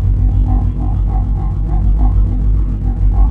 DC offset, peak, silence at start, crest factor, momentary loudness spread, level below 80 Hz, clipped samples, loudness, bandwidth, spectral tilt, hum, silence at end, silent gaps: under 0.1%; -2 dBFS; 0 s; 10 dB; 4 LU; -12 dBFS; under 0.1%; -16 LUFS; 2 kHz; -11 dB/octave; none; 0 s; none